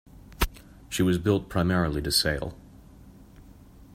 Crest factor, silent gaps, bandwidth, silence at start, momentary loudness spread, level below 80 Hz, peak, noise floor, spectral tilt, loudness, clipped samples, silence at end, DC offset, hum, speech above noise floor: 20 dB; none; 16 kHz; 0.3 s; 9 LU; -40 dBFS; -8 dBFS; -50 dBFS; -4.5 dB/octave; -26 LUFS; under 0.1%; 0 s; under 0.1%; none; 25 dB